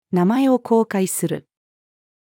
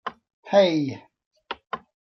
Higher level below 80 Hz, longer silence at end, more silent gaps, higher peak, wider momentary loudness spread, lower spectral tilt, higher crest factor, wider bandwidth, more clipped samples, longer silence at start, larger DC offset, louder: about the same, -74 dBFS vs -70 dBFS; first, 0.9 s vs 0.4 s; second, none vs 0.33-0.43 s, 1.26-1.31 s; about the same, -6 dBFS vs -6 dBFS; second, 9 LU vs 19 LU; about the same, -6 dB/octave vs -6 dB/octave; second, 14 dB vs 20 dB; first, 18 kHz vs 6.4 kHz; neither; about the same, 0.1 s vs 0.05 s; neither; first, -19 LUFS vs -23 LUFS